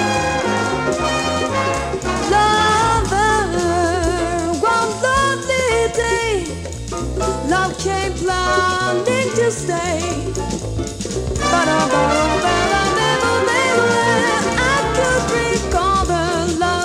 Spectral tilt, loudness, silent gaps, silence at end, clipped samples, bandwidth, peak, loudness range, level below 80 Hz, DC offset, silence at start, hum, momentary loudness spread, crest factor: -4 dB/octave; -17 LUFS; none; 0 s; under 0.1%; 15.5 kHz; -2 dBFS; 3 LU; -32 dBFS; under 0.1%; 0 s; none; 7 LU; 16 dB